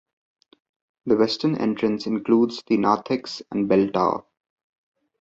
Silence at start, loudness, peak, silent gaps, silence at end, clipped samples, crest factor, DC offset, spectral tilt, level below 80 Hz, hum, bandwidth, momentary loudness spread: 1.05 s; -22 LUFS; -4 dBFS; none; 1 s; under 0.1%; 18 dB; under 0.1%; -6.5 dB/octave; -62 dBFS; none; 7.8 kHz; 8 LU